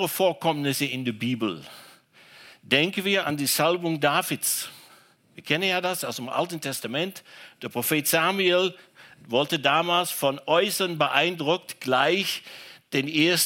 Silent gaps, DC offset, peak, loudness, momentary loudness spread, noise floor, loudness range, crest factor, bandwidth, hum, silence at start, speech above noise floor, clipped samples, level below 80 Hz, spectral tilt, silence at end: none; under 0.1%; -4 dBFS; -24 LUFS; 9 LU; -56 dBFS; 4 LU; 22 dB; 17 kHz; none; 0 s; 31 dB; under 0.1%; -74 dBFS; -3 dB/octave; 0 s